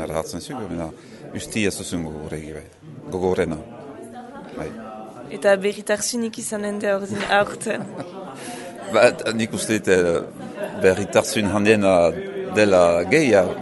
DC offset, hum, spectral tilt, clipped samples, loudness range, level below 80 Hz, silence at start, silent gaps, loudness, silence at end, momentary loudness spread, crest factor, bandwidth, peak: under 0.1%; none; -4.5 dB/octave; under 0.1%; 10 LU; -52 dBFS; 0 s; none; -20 LUFS; 0 s; 20 LU; 20 dB; 12 kHz; -2 dBFS